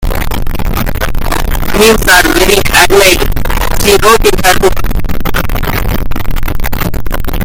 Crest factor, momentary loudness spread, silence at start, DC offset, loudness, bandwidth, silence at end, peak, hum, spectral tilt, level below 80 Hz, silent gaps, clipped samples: 8 dB; 12 LU; 0 s; under 0.1%; -10 LUFS; over 20 kHz; 0 s; 0 dBFS; none; -3.5 dB/octave; -14 dBFS; none; 2%